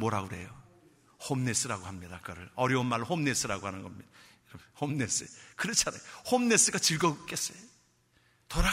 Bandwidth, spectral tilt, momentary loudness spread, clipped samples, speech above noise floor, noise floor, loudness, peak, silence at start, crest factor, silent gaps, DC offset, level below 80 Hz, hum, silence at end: 16 kHz; -3 dB/octave; 19 LU; under 0.1%; 36 dB; -68 dBFS; -30 LUFS; -10 dBFS; 0 s; 22 dB; none; under 0.1%; -46 dBFS; none; 0 s